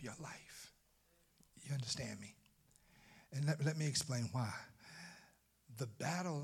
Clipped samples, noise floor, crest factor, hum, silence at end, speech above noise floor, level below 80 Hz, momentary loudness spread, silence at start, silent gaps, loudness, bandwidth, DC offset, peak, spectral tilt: under 0.1%; -74 dBFS; 20 dB; none; 0 s; 33 dB; -76 dBFS; 19 LU; 0 s; none; -42 LUFS; 15.5 kHz; under 0.1%; -24 dBFS; -4.5 dB/octave